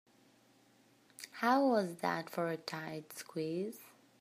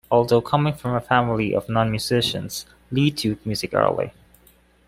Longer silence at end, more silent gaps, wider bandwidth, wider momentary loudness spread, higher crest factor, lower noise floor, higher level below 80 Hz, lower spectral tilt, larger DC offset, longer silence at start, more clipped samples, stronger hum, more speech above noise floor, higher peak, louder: second, 0.3 s vs 0.75 s; neither; about the same, 15.5 kHz vs 16 kHz; first, 16 LU vs 9 LU; about the same, 20 dB vs 20 dB; first, -68 dBFS vs -56 dBFS; second, -90 dBFS vs -50 dBFS; about the same, -5 dB/octave vs -5.5 dB/octave; neither; first, 1.2 s vs 0.1 s; neither; neither; about the same, 32 dB vs 35 dB; second, -18 dBFS vs -2 dBFS; second, -36 LUFS vs -22 LUFS